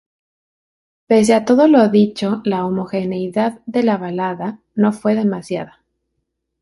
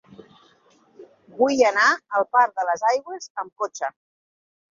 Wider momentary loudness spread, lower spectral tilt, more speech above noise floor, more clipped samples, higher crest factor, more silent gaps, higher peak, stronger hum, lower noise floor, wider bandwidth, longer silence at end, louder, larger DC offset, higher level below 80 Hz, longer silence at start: about the same, 13 LU vs 15 LU; first, -6.5 dB/octave vs -2 dB/octave; first, 58 dB vs 37 dB; neither; about the same, 14 dB vs 18 dB; second, none vs 3.30-3.35 s, 3.52-3.56 s; first, -2 dBFS vs -6 dBFS; neither; first, -74 dBFS vs -58 dBFS; first, 11.5 kHz vs 7.6 kHz; first, 0.95 s vs 0.8 s; first, -17 LUFS vs -21 LUFS; neither; first, -60 dBFS vs -72 dBFS; about the same, 1.1 s vs 1 s